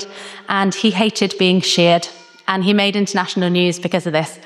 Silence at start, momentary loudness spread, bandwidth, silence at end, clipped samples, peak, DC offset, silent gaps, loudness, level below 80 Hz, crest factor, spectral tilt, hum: 0 s; 8 LU; 12.5 kHz; 0 s; under 0.1%; -2 dBFS; under 0.1%; none; -16 LUFS; -66 dBFS; 16 dB; -4.5 dB/octave; none